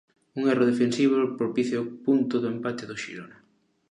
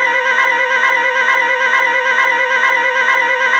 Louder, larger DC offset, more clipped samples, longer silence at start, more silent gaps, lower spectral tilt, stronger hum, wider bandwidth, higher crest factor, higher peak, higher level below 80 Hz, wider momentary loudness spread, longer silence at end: second, -25 LUFS vs -12 LUFS; neither; neither; first, 0.35 s vs 0 s; neither; first, -6 dB/octave vs 0 dB/octave; neither; second, 10.5 kHz vs 13 kHz; about the same, 16 dB vs 12 dB; second, -10 dBFS vs -2 dBFS; about the same, -74 dBFS vs -70 dBFS; first, 13 LU vs 1 LU; first, 0.65 s vs 0 s